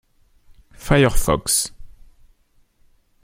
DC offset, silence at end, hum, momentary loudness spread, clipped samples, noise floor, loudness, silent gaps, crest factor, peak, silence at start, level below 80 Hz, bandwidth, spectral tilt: under 0.1%; 1.3 s; none; 12 LU; under 0.1%; -58 dBFS; -19 LUFS; none; 20 dB; -2 dBFS; 0.8 s; -32 dBFS; 16.5 kHz; -4 dB/octave